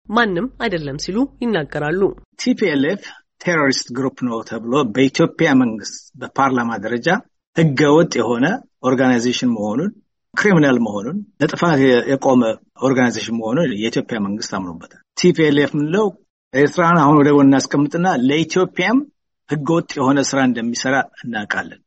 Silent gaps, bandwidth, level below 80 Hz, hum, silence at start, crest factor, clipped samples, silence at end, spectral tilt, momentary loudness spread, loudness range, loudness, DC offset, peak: 2.25-2.32 s, 7.47-7.53 s, 16.30-16.51 s; 8.4 kHz; -54 dBFS; none; 0.1 s; 16 dB; under 0.1%; 0.1 s; -5.5 dB/octave; 11 LU; 4 LU; -17 LUFS; under 0.1%; -2 dBFS